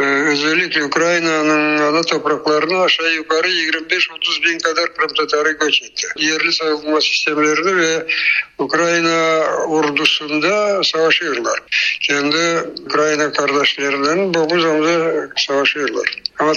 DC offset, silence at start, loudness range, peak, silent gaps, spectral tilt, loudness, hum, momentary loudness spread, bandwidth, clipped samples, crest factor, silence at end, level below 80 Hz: under 0.1%; 0 s; 1 LU; 0 dBFS; none; -2.5 dB/octave; -15 LUFS; none; 3 LU; 9 kHz; under 0.1%; 16 dB; 0 s; -62 dBFS